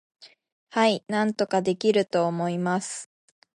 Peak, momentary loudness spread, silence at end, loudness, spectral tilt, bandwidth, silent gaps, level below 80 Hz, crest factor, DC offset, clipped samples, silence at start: -8 dBFS; 7 LU; 0.5 s; -25 LUFS; -5 dB/octave; 11.5 kHz; 0.52-0.67 s; -74 dBFS; 18 dB; under 0.1%; under 0.1%; 0.2 s